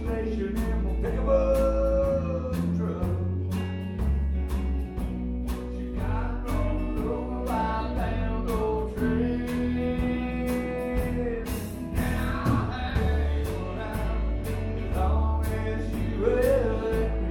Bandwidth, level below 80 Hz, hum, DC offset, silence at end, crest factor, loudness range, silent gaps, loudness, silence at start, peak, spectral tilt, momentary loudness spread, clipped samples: 17.5 kHz; -30 dBFS; none; under 0.1%; 0 s; 16 dB; 4 LU; none; -28 LUFS; 0 s; -10 dBFS; -7.5 dB/octave; 7 LU; under 0.1%